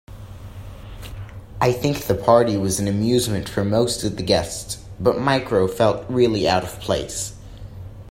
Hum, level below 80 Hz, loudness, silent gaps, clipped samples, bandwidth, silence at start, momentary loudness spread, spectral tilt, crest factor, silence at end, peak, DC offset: none; -42 dBFS; -20 LUFS; none; under 0.1%; 16.5 kHz; 0.1 s; 21 LU; -5 dB/octave; 20 dB; 0 s; 0 dBFS; under 0.1%